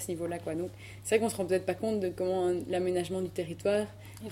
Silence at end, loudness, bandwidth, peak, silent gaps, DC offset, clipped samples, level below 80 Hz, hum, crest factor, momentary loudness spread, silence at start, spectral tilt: 0 s; -32 LUFS; 16 kHz; -12 dBFS; none; under 0.1%; under 0.1%; -62 dBFS; none; 20 dB; 9 LU; 0 s; -5.5 dB/octave